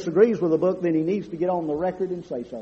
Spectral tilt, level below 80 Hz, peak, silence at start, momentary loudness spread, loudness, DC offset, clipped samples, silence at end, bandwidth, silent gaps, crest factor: -8.5 dB/octave; -60 dBFS; -6 dBFS; 0 s; 10 LU; -24 LUFS; under 0.1%; under 0.1%; 0 s; 7.4 kHz; none; 18 dB